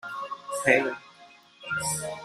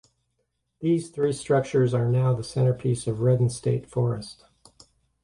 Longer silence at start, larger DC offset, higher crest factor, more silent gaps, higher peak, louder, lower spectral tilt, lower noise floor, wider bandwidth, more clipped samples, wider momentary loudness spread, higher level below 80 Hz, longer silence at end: second, 0.05 s vs 0.8 s; neither; first, 24 dB vs 14 dB; neither; first, -6 dBFS vs -10 dBFS; about the same, -27 LUFS vs -25 LUFS; second, -3 dB/octave vs -7.5 dB/octave; second, -54 dBFS vs -76 dBFS; first, 13.5 kHz vs 11 kHz; neither; first, 16 LU vs 5 LU; second, -64 dBFS vs -56 dBFS; second, 0 s vs 0.9 s